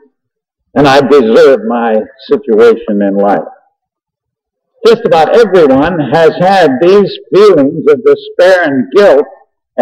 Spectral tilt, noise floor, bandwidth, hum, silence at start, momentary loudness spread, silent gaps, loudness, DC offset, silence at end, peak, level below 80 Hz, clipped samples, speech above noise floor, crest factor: -6.5 dB/octave; -76 dBFS; 11 kHz; none; 0.75 s; 6 LU; none; -7 LUFS; under 0.1%; 0 s; 0 dBFS; -44 dBFS; 0.7%; 70 dB; 8 dB